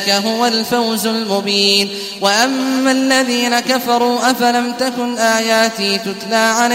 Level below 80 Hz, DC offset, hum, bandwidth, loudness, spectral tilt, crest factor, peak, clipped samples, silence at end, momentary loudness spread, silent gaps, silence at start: -60 dBFS; under 0.1%; none; 16 kHz; -14 LUFS; -2.5 dB/octave; 14 dB; 0 dBFS; under 0.1%; 0 s; 5 LU; none; 0 s